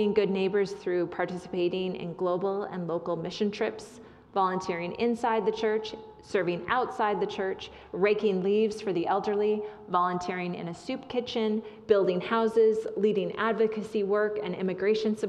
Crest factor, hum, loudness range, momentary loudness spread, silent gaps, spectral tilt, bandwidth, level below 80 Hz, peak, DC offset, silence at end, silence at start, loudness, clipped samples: 18 dB; none; 4 LU; 8 LU; none; -6.5 dB/octave; 10.5 kHz; -66 dBFS; -10 dBFS; under 0.1%; 0 s; 0 s; -29 LUFS; under 0.1%